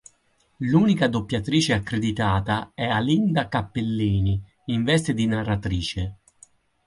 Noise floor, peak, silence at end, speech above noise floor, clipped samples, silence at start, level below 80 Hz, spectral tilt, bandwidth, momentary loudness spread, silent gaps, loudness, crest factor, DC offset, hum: -65 dBFS; -6 dBFS; 0.75 s; 42 dB; under 0.1%; 0.6 s; -42 dBFS; -6 dB/octave; 11.5 kHz; 7 LU; none; -23 LUFS; 16 dB; under 0.1%; none